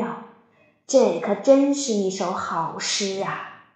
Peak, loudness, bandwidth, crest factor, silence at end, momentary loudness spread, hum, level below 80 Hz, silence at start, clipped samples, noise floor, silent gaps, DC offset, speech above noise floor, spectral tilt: -4 dBFS; -22 LUFS; 9.4 kHz; 20 dB; 0.2 s; 12 LU; none; -72 dBFS; 0 s; under 0.1%; -59 dBFS; none; under 0.1%; 38 dB; -4 dB/octave